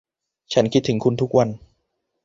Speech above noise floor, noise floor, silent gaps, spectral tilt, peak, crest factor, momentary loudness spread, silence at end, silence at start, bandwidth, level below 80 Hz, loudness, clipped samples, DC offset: 55 dB; -74 dBFS; none; -6.5 dB/octave; -2 dBFS; 20 dB; 6 LU; 0.7 s; 0.5 s; 7.8 kHz; -54 dBFS; -20 LUFS; under 0.1%; under 0.1%